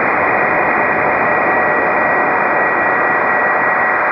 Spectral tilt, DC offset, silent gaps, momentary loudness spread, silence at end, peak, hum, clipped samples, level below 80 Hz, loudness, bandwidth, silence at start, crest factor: -8 dB/octave; under 0.1%; none; 0 LU; 0 s; -2 dBFS; none; under 0.1%; -48 dBFS; -13 LUFS; 5.8 kHz; 0 s; 12 dB